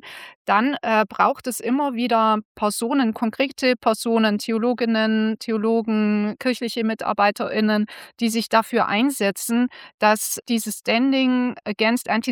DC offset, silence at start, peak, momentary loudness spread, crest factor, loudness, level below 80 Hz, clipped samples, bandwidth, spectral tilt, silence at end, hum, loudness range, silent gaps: under 0.1%; 0.05 s; -4 dBFS; 5 LU; 18 dB; -21 LUFS; -68 dBFS; under 0.1%; 19 kHz; -4 dB/octave; 0 s; none; 1 LU; 0.35-0.45 s, 2.45-2.55 s, 9.94-9.98 s